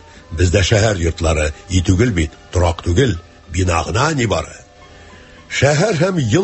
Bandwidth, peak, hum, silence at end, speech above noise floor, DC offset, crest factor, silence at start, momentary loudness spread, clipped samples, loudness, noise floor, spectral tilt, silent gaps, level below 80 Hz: 8.6 kHz; 0 dBFS; none; 0 s; 26 dB; under 0.1%; 16 dB; 0.3 s; 8 LU; under 0.1%; -16 LUFS; -41 dBFS; -5 dB/octave; none; -26 dBFS